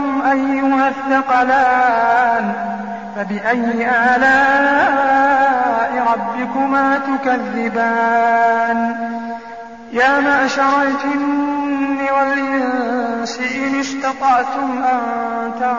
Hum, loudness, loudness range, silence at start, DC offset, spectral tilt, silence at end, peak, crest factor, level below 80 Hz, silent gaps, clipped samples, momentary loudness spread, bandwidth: none; -16 LUFS; 4 LU; 0 s; 0.4%; -2.5 dB/octave; 0 s; -4 dBFS; 12 dB; -56 dBFS; none; under 0.1%; 9 LU; 7.8 kHz